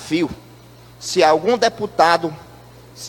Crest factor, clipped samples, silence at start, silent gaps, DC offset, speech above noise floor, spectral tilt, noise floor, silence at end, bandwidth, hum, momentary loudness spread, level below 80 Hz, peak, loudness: 18 dB; under 0.1%; 0 s; none; under 0.1%; 26 dB; -4 dB/octave; -43 dBFS; 0 s; 17.5 kHz; none; 17 LU; -52 dBFS; 0 dBFS; -17 LUFS